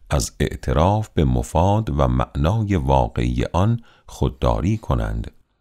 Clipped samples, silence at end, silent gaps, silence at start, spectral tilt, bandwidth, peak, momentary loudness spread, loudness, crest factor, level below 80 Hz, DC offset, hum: under 0.1%; 0.3 s; none; 0.1 s; -7 dB/octave; 15.5 kHz; -4 dBFS; 7 LU; -21 LUFS; 16 dB; -28 dBFS; under 0.1%; none